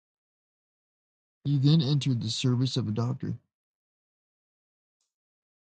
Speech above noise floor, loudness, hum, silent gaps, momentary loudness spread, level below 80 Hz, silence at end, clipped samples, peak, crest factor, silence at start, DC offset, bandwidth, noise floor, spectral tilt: over 64 dB; -27 LUFS; none; none; 14 LU; -66 dBFS; 2.3 s; under 0.1%; -12 dBFS; 20 dB; 1.45 s; under 0.1%; 9.2 kHz; under -90 dBFS; -6.5 dB/octave